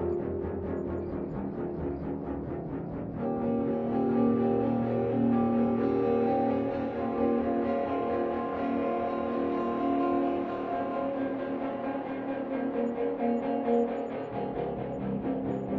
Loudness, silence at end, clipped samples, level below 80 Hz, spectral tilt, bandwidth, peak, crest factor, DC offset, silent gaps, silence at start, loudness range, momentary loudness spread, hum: -30 LUFS; 0 s; under 0.1%; -54 dBFS; -10 dB/octave; 4.8 kHz; -16 dBFS; 14 dB; under 0.1%; none; 0 s; 5 LU; 8 LU; none